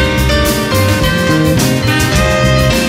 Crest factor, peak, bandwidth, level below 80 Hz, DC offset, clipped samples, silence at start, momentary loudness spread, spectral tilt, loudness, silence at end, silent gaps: 10 dB; 0 dBFS; 16.5 kHz; -20 dBFS; under 0.1%; under 0.1%; 0 s; 2 LU; -5 dB/octave; -11 LUFS; 0 s; none